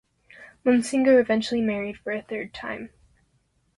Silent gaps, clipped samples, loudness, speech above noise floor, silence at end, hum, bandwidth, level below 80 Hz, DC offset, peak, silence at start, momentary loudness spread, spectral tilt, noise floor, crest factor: none; under 0.1%; -24 LUFS; 45 dB; 0.9 s; none; 11.5 kHz; -60 dBFS; under 0.1%; -8 dBFS; 0.4 s; 15 LU; -5 dB/octave; -68 dBFS; 18 dB